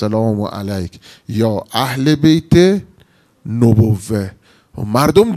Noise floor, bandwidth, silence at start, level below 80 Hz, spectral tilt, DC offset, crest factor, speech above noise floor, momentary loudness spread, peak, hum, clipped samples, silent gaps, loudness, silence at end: -51 dBFS; 14.5 kHz; 0 s; -42 dBFS; -7 dB/octave; under 0.1%; 14 dB; 37 dB; 15 LU; 0 dBFS; none; 0.2%; none; -15 LUFS; 0 s